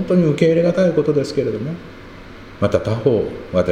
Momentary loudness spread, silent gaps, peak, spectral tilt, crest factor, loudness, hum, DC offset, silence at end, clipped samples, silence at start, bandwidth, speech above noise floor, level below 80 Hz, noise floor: 23 LU; none; 0 dBFS; -8 dB/octave; 18 dB; -18 LUFS; none; under 0.1%; 0 s; under 0.1%; 0 s; 10 kHz; 20 dB; -44 dBFS; -37 dBFS